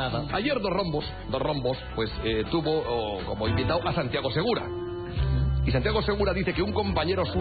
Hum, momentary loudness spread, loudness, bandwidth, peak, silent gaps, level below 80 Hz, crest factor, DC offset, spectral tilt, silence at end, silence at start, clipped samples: none; 5 LU; -27 LUFS; 4.9 kHz; -12 dBFS; none; -36 dBFS; 16 dB; 0.1%; -5 dB/octave; 0 s; 0 s; under 0.1%